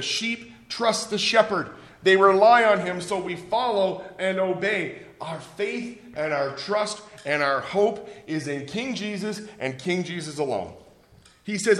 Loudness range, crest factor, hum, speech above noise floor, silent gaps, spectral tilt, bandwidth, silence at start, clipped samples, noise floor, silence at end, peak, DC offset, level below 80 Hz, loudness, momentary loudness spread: 8 LU; 20 dB; none; 31 dB; none; -4 dB/octave; 12.5 kHz; 0 s; under 0.1%; -55 dBFS; 0 s; -4 dBFS; under 0.1%; -64 dBFS; -24 LUFS; 16 LU